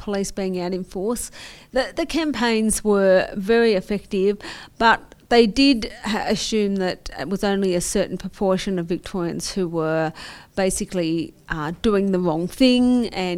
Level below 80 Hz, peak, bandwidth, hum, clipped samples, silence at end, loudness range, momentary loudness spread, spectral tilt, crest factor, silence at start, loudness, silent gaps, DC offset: -42 dBFS; -2 dBFS; 16 kHz; none; under 0.1%; 0 s; 5 LU; 10 LU; -4.5 dB/octave; 20 dB; 0 s; -21 LUFS; none; under 0.1%